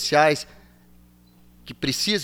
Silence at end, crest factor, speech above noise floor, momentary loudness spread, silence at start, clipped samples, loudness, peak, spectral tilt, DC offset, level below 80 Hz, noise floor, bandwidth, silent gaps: 0 s; 20 dB; 32 dB; 22 LU; 0 s; under 0.1%; -22 LUFS; -4 dBFS; -3 dB/octave; under 0.1%; -54 dBFS; -54 dBFS; 18.5 kHz; none